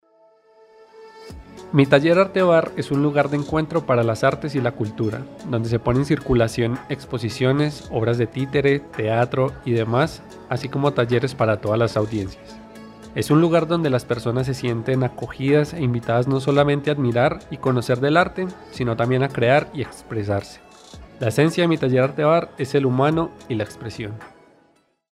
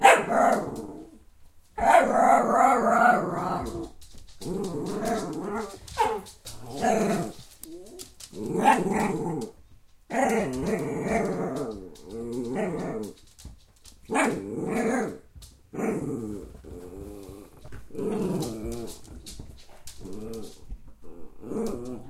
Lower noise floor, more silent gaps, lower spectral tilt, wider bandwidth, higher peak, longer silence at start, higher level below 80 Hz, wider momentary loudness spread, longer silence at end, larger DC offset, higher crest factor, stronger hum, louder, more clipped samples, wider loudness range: first, -61 dBFS vs -53 dBFS; neither; first, -7 dB/octave vs -5 dB/octave; second, 13.5 kHz vs 16 kHz; about the same, 0 dBFS vs -2 dBFS; first, 1 s vs 0 s; about the same, -46 dBFS vs -50 dBFS; second, 12 LU vs 23 LU; first, 0.85 s vs 0 s; neither; about the same, 20 dB vs 24 dB; neither; first, -21 LUFS vs -26 LUFS; neither; second, 3 LU vs 12 LU